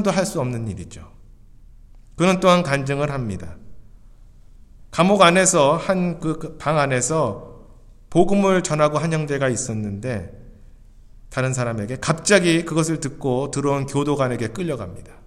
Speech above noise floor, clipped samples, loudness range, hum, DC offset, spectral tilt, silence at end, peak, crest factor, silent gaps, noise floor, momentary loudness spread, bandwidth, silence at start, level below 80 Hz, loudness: 25 dB; under 0.1%; 4 LU; none; under 0.1%; -5 dB/octave; 0.15 s; 0 dBFS; 20 dB; none; -45 dBFS; 14 LU; 14 kHz; 0 s; -44 dBFS; -20 LUFS